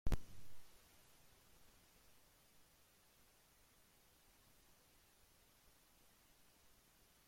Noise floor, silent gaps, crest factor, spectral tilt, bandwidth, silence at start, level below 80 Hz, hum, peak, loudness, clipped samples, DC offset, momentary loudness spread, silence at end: -72 dBFS; none; 22 dB; -5.5 dB/octave; 16.5 kHz; 0.05 s; -56 dBFS; none; -26 dBFS; -55 LUFS; under 0.1%; under 0.1%; 19 LU; 6.55 s